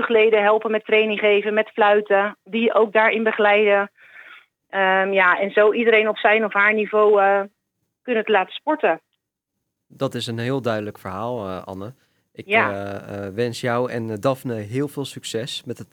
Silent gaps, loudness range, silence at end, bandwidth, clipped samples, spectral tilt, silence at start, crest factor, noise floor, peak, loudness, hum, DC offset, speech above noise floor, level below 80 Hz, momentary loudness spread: none; 8 LU; 0.1 s; 15 kHz; under 0.1%; -5 dB/octave; 0 s; 18 dB; -80 dBFS; -2 dBFS; -19 LUFS; none; under 0.1%; 60 dB; -74 dBFS; 14 LU